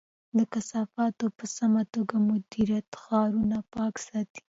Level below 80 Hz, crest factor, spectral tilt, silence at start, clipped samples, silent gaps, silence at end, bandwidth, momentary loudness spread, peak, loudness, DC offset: -62 dBFS; 16 dB; -6 dB/octave; 0.35 s; under 0.1%; 2.88-2.92 s, 4.30-4.35 s; 0.1 s; 8 kHz; 6 LU; -12 dBFS; -29 LUFS; under 0.1%